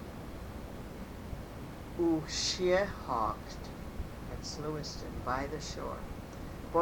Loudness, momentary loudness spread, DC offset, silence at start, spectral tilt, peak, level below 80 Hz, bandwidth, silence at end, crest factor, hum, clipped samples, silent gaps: -37 LUFS; 14 LU; under 0.1%; 0 s; -4.5 dB/octave; -16 dBFS; -48 dBFS; 19 kHz; 0 s; 20 dB; none; under 0.1%; none